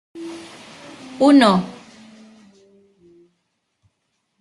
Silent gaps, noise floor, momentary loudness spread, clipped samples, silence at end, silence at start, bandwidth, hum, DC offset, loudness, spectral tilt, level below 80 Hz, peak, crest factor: none; -72 dBFS; 27 LU; under 0.1%; 2.7 s; 0.15 s; 11.5 kHz; none; under 0.1%; -15 LUFS; -6 dB/octave; -64 dBFS; -2 dBFS; 20 dB